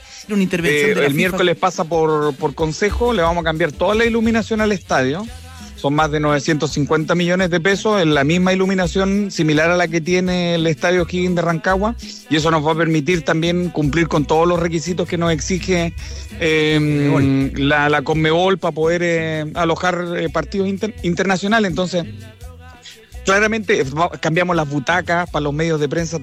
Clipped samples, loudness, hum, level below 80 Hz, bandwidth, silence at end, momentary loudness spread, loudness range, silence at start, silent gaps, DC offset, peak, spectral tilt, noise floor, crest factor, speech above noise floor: under 0.1%; -17 LUFS; none; -36 dBFS; 15 kHz; 0 s; 6 LU; 3 LU; 0 s; none; under 0.1%; -4 dBFS; -5.5 dB/octave; -40 dBFS; 12 dB; 23 dB